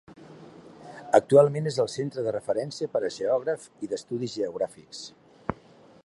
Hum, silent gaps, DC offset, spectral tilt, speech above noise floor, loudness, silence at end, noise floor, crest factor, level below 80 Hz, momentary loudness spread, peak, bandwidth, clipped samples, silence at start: none; none; under 0.1%; -6 dB/octave; 28 dB; -27 LUFS; 0.5 s; -54 dBFS; 24 dB; -62 dBFS; 21 LU; -4 dBFS; 11.5 kHz; under 0.1%; 0.1 s